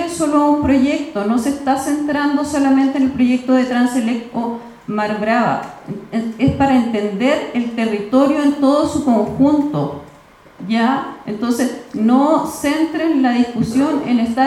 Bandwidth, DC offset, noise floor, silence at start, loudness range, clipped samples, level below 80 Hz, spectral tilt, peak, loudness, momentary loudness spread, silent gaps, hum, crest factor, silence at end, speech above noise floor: 13 kHz; under 0.1%; -44 dBFS; 0 s; 3 LU; under 0.1%; -48 dBFS; -5.5 dB/octave; -2 dBFS; -16 LUFS; 9 LU; none; none; 14 dB; 0 s; 28 dB